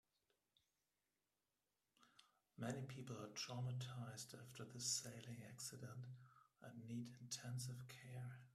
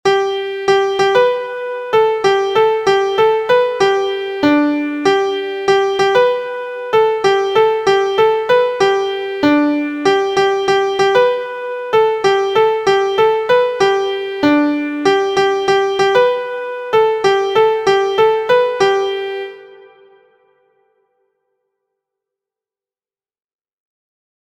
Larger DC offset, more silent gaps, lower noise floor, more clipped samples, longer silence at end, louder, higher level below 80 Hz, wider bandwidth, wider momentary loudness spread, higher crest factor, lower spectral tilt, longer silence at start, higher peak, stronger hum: neither; neither; about the same, under -90 dBFS vs under -90 dBFS; neither; second, 0 s vs 4.8 s; second, -51 LUFS vs -14 LUFS; second, -84 dBFS vs -56 dBFS; first, 14.5 kHz vs 9.8 kHz; first, 12 LU vs 7 LU; first, 22 dB vs 14 dB; about the same, -3.5 dB/octave vs -4 dB/octave; first, 2 s vs 0.05 s; second, -32 dBFS vs 0 dBFS; neither